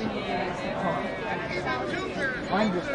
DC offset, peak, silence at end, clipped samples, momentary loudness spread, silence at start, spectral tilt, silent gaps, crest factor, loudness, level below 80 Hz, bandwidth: under 0.1%; -12 dBFS; 0 s; under 0.1%; 4 LU; 0 s; -5.5 dB/octave; none; 16 dB; -29 LUFS; -50 dBFS; 11 kHz